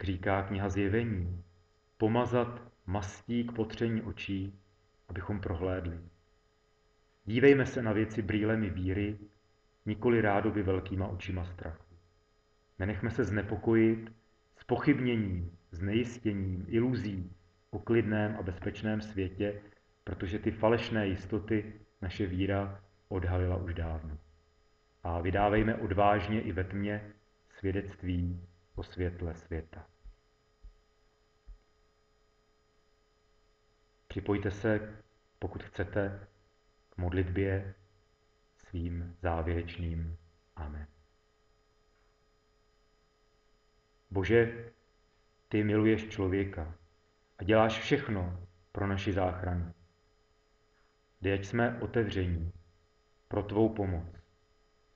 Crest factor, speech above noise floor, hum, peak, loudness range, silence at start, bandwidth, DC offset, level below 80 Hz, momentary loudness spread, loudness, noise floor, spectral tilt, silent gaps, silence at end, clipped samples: 22 dB; 38 dB; none; -10 dBFS; 8 LU; 0 s; 7.4 kHz; under 0.1%; -52 dBFS; 17 LU; -33 LUFS; -70 dBFS; -6.5 dB/octave; none; 0.75 s; under 0.1%